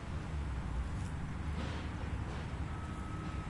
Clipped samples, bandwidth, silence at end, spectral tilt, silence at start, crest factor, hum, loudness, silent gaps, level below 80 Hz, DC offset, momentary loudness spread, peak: under 0.1%; 11.5 kHz; 0 s; -6.5 dB/octave; 0 s; 12 dB; none; -41 LUFS; none; -44 dBFS; under 0.1%; 2 LU; -26 dBFS